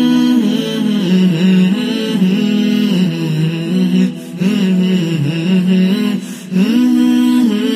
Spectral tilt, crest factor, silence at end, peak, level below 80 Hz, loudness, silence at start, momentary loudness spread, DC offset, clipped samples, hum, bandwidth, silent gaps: -7 dB/octave; 10 dB; 0 s; -2 dBFS; -58 dBFS; -13 LUFS; 0 s; 5 LU; under 0.1%; under 0.1%; none; 15 kHz; none